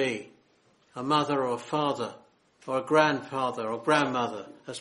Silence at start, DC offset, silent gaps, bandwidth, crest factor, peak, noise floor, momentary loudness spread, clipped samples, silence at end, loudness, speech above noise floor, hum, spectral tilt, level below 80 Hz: 0 s; under 0.1%; none; 11.5 kHz; 22 dB; -8 dBFS; -65 dBFS; 15 LU; under 0.1%; 0 s; -28 LUFS; 37 dB; none; -5 dB/octave; -72 dBFS